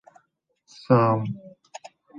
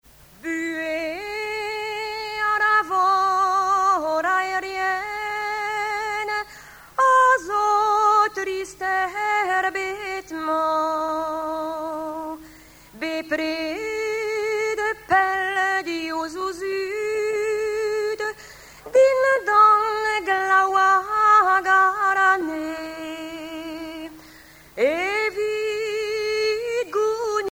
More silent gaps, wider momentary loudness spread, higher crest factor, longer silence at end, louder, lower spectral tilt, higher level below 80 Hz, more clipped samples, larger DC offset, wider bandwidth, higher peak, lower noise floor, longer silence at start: neither; first, 25 LU vs 13 LU; first, 22 dB vs 16 dB; about the same, 0 s vs 0 s; about the same, -22 LUFS vs -21 LUFS; first, -8.5 dB/octave vs -2.5 dB/octave; second, -68 dBFS vs -58 dBFS; neither; neither; second, 7.4 kHz vs over 20 kHz; about the same, -6 dBFS vs -6 dBFS; first, -70 dBFS vs -47 dBFS; first, 0.9 s vs 0.45 s